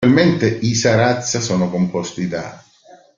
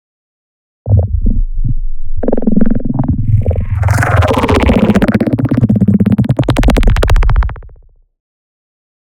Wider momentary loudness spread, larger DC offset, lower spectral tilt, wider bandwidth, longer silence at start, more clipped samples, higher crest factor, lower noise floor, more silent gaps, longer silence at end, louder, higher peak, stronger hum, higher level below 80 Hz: about the same, 10 LU vs 10 LU; neither; second, -5 dB/octave vs -7.5 dB/octave; second, 7.6 kHz vs 13 kHz; second, 0 s vs 0.85 s; neither; first, 16 dB vs 10 dB; first, -47 dBFS vs -41 dBFS; neither; second, 0.6 s vs 1.4 s; second, -17 LUFS vs -12 LUFS; about the same, -2 dBFS vs 0 dBFS; neither; second, -50 dBFS vs -16 dBFS